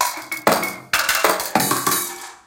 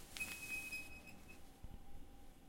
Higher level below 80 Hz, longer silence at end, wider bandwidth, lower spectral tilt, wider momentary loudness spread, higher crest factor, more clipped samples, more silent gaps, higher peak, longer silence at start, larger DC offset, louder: about the same, -56 dBFS vs -60 dBFS; about the same, 0.1 s vs 0 s; about the same, 17.5 kHz vs 16.5 kHz; about the same, -1.5 dB/octave vs -2 dB/octave; second, 5 LU vs 18 LU; about the same, 20 dB vs 22 dB; neither; neither; first, 0 dBFS vs -28 dBFS; about the same, 0 s vs 0 s; neither; first, -19 LUFS vs -47 LUFS